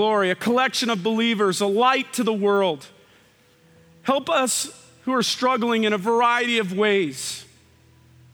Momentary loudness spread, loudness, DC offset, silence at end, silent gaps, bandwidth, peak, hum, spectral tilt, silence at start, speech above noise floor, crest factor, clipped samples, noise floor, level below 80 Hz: 10 LU; -21 LUFS; under 0.1%; 0.9 s; none; over 20 kHz; -6 dBFS; none; -3.5 dB/octave; 0 s; 35 dB; 16 dB; under 0.1%; -56 dBFS; -70 dBFS